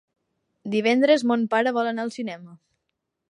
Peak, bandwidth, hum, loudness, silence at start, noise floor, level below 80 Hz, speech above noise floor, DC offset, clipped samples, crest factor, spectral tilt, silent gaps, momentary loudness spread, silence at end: -6 dBFS; 11 kHz; none; -22 LUFS; 0.65 s; -80 dBFS; -78 dBFS; 58 dB; under 0.1%; under 0.1%; 18 dB; -5 dB/octave; none; 15 LU; 0.75 s